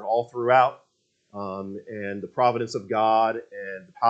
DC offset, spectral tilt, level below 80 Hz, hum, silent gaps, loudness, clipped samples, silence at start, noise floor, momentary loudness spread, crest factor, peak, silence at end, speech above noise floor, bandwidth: under 0.1%; -6 dB/octave; -76 dBFS; none; none; -24 LUFS; under 0.1%; 0 s; -65 dBFS; 16 LU; 20 dB; -6 dBFS; 0 s; 41 dB; 8.2 kHz